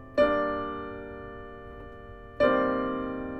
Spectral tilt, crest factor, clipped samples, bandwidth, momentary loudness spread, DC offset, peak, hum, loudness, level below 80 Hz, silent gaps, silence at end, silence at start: -7.5 dB/octave; 18 dB; under 0.1%; 7.8 kHz; 21 LU; under 0.1%; -10 dBFS; none; -28 LUFS; -50 dBFS; none; 0 s; 0 s